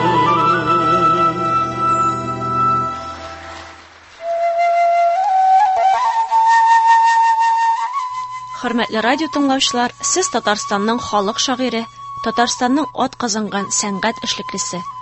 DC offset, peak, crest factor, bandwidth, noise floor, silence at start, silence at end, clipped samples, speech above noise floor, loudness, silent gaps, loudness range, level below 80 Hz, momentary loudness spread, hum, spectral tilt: under 0.1%; -2 dBFS; 16 dB; 8.6 kHz; -41 dBFS; 0 s; 0 s; under 0.1%; 22 dB; -16 LUFS; none; 6 LU; -50 dBFS; 12 LU; none; -3 dB/octave